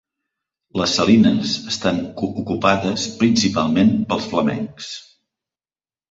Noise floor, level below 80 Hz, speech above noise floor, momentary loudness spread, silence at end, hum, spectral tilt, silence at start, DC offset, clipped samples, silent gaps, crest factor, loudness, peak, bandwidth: under -90 dBFS; -50 dBFS; over 72 dB; 14 LU; 1.1 s; none; -5 dB/octave; 0.75 s; under 0.1%; under 0.1%; none; 18 dB; -18 LUFS; -2 dBFS; 7.8 kHz